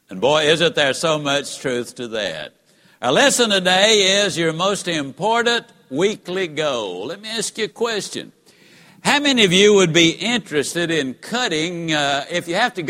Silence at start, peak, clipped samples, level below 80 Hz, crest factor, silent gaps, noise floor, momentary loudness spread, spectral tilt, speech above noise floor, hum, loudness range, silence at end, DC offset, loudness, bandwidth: 0.1 s; 0 dBFS; under 0.1%; -60 dBFS; 18 dB; none; -50 dBFS; 12 LU; -3 dB/octave; 31 dB; none; 6 LU; 0 s; under 0.1%; -18 LUFS; 16.5 kHz